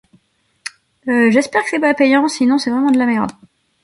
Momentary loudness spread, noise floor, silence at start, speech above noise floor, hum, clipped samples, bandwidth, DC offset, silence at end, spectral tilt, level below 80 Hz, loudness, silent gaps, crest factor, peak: 19 LU; -58 dBFS; 1.05 s; 44 dB; none; under 0.1%; 11.5 kHz; under 0.1%; 0.5 s; -4.5 dB/octave; -60 dBFS; -15 LUFS; none; 14 dB; -2 dBFS